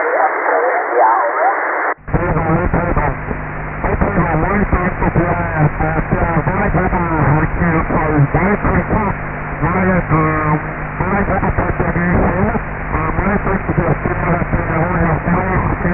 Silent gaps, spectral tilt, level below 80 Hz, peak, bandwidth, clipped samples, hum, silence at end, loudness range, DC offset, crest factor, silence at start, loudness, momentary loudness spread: none; -13.5 dB/octave; -24 dBFS; 0 dBFS; 3.1 kHz; under 0.1%; none; 0 s; 2 LU; under 0.1%; 14 dB; 0 s; -16 LUFS; 5 LU